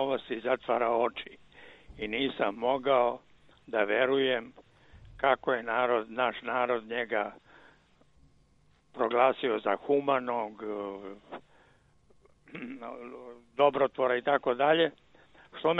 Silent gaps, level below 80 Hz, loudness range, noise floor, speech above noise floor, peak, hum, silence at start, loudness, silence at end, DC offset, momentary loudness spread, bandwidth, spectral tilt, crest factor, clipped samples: none; -66 dBFS; 5 LU; -65 dBFS; 36 dB; -10 dBFS; none; 0 s; -29 LUFS; 0 s; under 0.1%; 18 LU; 5 kHz; -7 dB/octave; 22 dB; under 0.1%